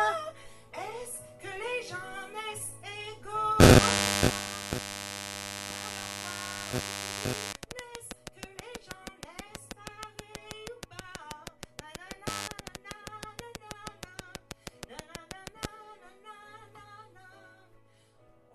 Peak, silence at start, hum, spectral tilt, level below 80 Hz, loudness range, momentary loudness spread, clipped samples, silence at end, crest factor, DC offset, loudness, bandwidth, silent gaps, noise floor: -4 dBFS; 0 s; none; -4.5 dB/octave; -44 dBFS; 20 LU; 18 LU; under 0.1%; 1.05 s; 28 dB; under 0.1%; -29 LUFS; 13.5 kHz; none; -62 dBFS